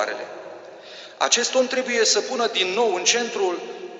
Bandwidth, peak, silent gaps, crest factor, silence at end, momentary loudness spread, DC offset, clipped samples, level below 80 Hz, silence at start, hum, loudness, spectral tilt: 8.2 kHz; -4 dBFS; none; 20 dB; 0 s; 21 LU; under 0.1%; under 0.1%; -74 dBFS; 0 s; none; -21 LUFS; 0 dB/octave